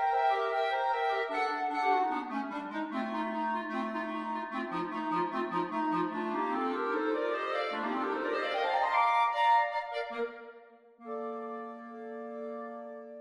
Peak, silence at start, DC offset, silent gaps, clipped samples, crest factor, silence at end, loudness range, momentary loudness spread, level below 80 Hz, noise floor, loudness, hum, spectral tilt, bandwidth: -16 dBFS; 0 s; under 0.1%; none; under 0.1%; 18 dB; 0 s; 5 LU; 15 LU; -76 dBFS; -56 dBFS; -32 LUFS; none; -5.5 dB/octave; 11 kHz